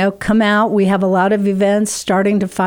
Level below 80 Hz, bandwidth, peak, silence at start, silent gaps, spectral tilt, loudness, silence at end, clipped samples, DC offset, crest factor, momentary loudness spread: -46 dBFS; 16.5 kHz; -4 dBFS; 0 s; none; -5.5 dB/octave; -14 LUFS; 0 s; under 0.1%; under 0.1%; 10 dB; 3 LU